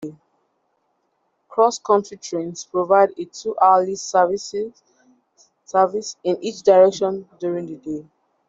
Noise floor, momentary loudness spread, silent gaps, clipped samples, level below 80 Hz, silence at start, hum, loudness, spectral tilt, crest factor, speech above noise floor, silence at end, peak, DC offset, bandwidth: -69 dBFS; 14 LU; none; under 0.1%; -68 dBFS; 0 s; none; -20 LUFS; -4.5 dB/octave; 18 dB; 50 dB; 0.45 s; -2 dBFS; under 0.1%; 7.8 kHz